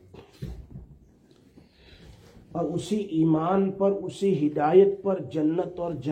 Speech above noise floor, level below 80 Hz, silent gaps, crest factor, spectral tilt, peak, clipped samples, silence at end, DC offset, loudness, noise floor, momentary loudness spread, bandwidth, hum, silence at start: 33 dB; -54 dBFS; none; 20 dB; -8 dB/octave; -6 dBFS; under 0.1%; 0 s; under 0.1%; -25 LUFS; -57 dBFS; 21 LU; 9.8 kHz; none; 0.15 s